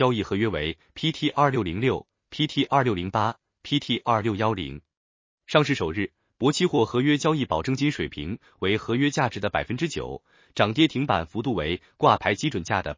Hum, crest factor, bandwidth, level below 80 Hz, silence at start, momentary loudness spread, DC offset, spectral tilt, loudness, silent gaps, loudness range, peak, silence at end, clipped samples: none; 22 dB; 7.6 kHz; -48 dBFS; 0 s; 10 LU; under 0.1%; -5.5 dB/octave; -25 LUFS; 4.97-5.38 s; 2 LU; -4 dBFS; 0.05 s; under 0.1%